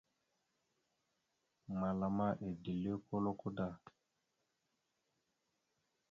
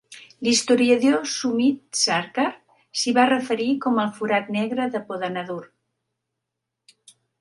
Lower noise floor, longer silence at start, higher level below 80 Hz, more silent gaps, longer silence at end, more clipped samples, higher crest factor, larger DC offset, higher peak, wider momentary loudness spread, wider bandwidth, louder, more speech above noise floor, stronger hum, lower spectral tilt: about the same, -85 dBFS vs -82 dBFS; first, 1.7 s vs 0.1 s; about the same, -70 dBFS vs -72 dBFS; neither; first, 2.35 s vs 1.75 s; neither; about the same, 20 dB vs 20 dB; neither; second, -26 dBFS vs -4 dBFS; second, 7 LU vs 10 LU; second, 7 kHz vs 11.5 kHz; second, -41 LUFS vs -22 LUFS; second, 45 dB vs 61 dB; neither; first, -8.5 dB/octave vs -3 dB/octave